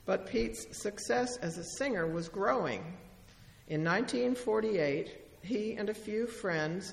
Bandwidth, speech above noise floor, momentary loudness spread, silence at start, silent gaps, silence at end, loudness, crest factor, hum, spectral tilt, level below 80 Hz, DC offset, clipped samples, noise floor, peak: 14.5 kHz; 23 dB; 8 LU; 0 s; none; 0 s; -34 LUFS; 18 dB; none; -5 dB/octave; -58 dBFS; under 0.1%; under 0.1%; -57 dBFS; -16 dBFS